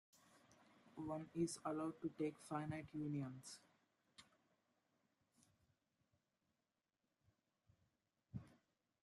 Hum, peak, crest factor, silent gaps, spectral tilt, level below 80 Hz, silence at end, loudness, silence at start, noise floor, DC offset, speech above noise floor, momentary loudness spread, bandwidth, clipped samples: none; -30 dBFS; 22 dB; none; -6 dB/octave; -82 dBFS; 0.5 s; -48 LUFS; 0.15 s; under -90 dBFS; under 0.1%; over 43 dB; 19 LU; 12 kHz; under 0.1%